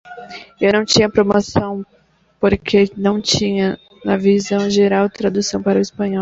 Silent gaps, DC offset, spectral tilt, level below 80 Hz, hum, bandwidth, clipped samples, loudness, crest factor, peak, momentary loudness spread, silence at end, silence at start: none; under 0.1%; -5 dB/octave; -44 dBFS; none; 7.8 kHz; under 0.1%; -16 LUFS; 16 dB; 0 dBFS; 10 LU; 0 s; 0.05 s